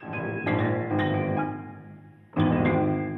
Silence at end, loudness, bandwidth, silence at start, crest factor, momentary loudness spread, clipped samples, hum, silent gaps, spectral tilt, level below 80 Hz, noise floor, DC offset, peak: 0 s; -26 LUFS; 4.2 kHz; 0 s; 16 dB; 13 LU; under 0.1%; none; none; -10 dB/octave; -54 dBFS; -47 dBFS; under 0.1%; -10 dBFS